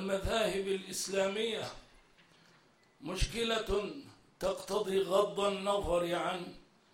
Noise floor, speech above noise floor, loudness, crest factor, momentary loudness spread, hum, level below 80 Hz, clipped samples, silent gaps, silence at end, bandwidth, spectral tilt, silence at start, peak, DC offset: -66 dBFS; 32 dB; -34 LUFS; 18 dB; 12 LU; none; -50 dBFS; under 0.1%; none; 0.3 s; 16 kHz; -4 dB/octave; 0 s; -16 dBFS; under 0.1%